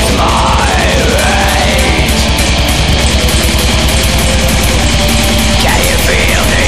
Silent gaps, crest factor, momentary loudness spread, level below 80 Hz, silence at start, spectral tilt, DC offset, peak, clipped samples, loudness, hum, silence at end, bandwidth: none; 10 dB; 1 LU; -14 dBFS; 0 s; -3.5 dB/octave; 5%; 0 dBFS; under 0.1%; -9 LUFS; none; 0 s; 15.5 kHz